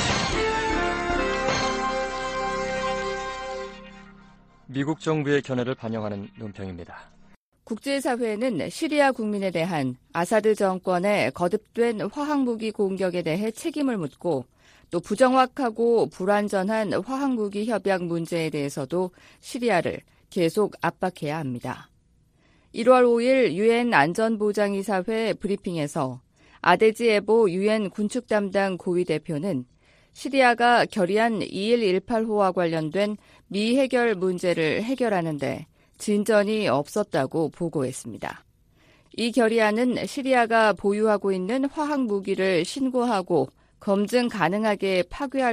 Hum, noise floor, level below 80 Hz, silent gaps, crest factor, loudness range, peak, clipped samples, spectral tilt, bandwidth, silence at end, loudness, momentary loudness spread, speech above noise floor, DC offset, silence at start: none; -61 dBFS; -50 dBFS; 7.36-7.52 s; 20 dB; 6 LU; -4 dBFS; under 0.1%; -5.5 dB/octave; 15 kHz; 0 s; -24 LUFS; 12 LU; 38 dB; under 0.1%; 0 s